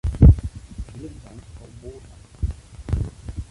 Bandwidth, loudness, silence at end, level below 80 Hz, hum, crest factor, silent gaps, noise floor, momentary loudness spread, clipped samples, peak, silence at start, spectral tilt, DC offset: 11 kHz; -21 LUFS; 0.1 s; -24 dBFS; none; 18 dB; none; -44 dBFS; 27 LU; under 0.1%; -2 dBFS; 0.05 s; -9 dB/octave; under 0.1%